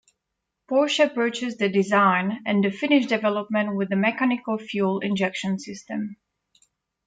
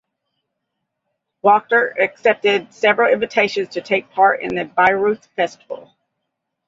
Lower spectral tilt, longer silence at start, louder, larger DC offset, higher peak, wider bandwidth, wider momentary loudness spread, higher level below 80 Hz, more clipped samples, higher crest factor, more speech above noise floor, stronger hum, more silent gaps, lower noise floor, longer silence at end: about the same, -5.5 dB/octave vs -4.5 dB/octave; second, 0.7 s vs 1.45 s; second, -23 LUFS vs -17 LUFS; neither; second, -6 dBFS vs -2 dBFS; first, 9.2 kHz vs 7.8 kHz; about the same, 10 LU vs 8 LU; second, -72 dBFS vs -62 dBFS; neither; about the same, 18 dB vs 18 dB; about the same, 59 dB vs 60 dB; neither; neither; first, -81 dBFS vs -77 dBFS; about the same, 0.95 s vs 0.9 s